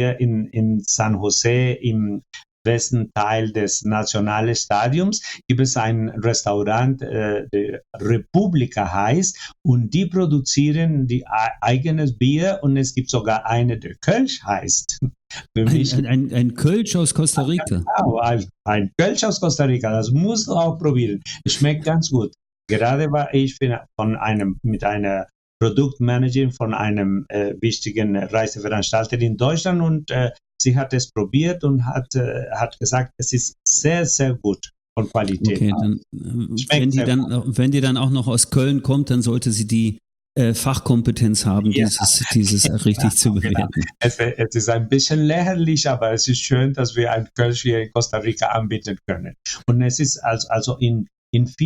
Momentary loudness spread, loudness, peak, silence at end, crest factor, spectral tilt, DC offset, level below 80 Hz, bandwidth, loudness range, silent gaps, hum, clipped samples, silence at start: 7 LU; -19 LUFS; -2 dBFS; 0 s; 18 dB; -5 dB/octave; under 0.1%; -46 dBFS; 14 kHz; 3 LU; 2.51-2.65 s, 25.35-25.60 s, 34.89-34.96 s, 51.18-51.33 s; none; under 0.1%; 0 s